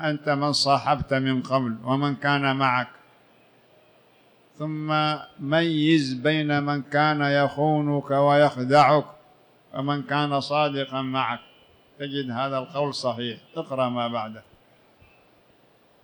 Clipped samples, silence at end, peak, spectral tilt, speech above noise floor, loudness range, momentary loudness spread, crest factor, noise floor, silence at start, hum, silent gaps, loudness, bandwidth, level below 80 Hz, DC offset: under 0.1%; 1.65 s; -6 dBFS; -6 dB/octave; 36 dB; 8 LU; 12 LU; 18 dB; -59 dBFS; 0 s; none; none; -23 LUFS; 19.5 kHz; -60 dBFS; under 0.1%